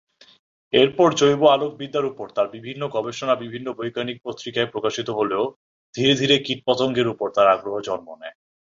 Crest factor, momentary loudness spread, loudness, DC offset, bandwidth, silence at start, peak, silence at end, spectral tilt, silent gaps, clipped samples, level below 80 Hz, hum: 20 dB; 13 LU; -21 LUFS; under 0.1%; 7.6 kHz; 0.75 s; -2 dBFS; 0.45 s; -4.5 dB/octave; 5.56-5.93 s; under 0.1%; -62 dBFS; none